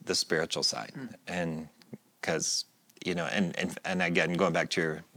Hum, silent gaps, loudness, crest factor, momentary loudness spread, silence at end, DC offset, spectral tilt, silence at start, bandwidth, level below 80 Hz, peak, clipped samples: none; none; -30 LUFS; 22 dB; 13 LU; 0.15 s; under 0.1%; -3.5 dB/octave; 0.05 s; 19 kHz; -72 dBFS; -10 dBFS; under 0.1%